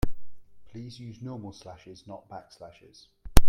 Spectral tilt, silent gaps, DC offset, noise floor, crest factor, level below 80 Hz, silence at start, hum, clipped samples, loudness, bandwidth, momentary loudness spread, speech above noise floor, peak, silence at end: -5 dB/octave; none; under 0.1%; -35 dBFS; 24 dB; -30 dBFS; 0.05 s; none; under 0.1%; -39 LUFS; 16 kHz; 12 LU; -8 dB; 0 dBFS; 0 s